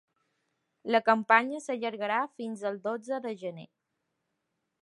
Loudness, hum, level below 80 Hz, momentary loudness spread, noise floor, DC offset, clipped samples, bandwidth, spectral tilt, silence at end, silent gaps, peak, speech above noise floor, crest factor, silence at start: -29 LUFS; none; -88 dBFS; 15 LU; -82 dBFS; under 0.1%; under 0.1%; 11.5 kHz; -4.5 dB/octave; 1.15 s; none; -6 dBFS; 53 dB; 24 dB; 0.85 s